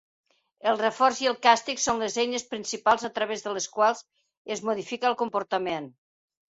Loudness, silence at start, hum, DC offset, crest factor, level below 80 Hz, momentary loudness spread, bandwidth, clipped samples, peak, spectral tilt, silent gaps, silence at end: -26 LUFS; 0.65 s; none; under 0.1%; 22 dB; -68 dBFS; 10 LU; 8 kHz; under 0.1%; -6 dBFS; -2 dB/octave; 4.37-4.45 s; 0.6 s